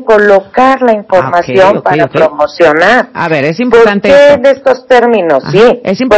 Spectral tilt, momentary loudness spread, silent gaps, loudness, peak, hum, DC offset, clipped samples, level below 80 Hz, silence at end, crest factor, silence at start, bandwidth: -6 dB/octave; 5 LU; none; -7 LUFS; 0 dBFS; none; under 0.1%; 10%; -42 dBFS; 0 s; 6 dB; 0 s; 8 kHz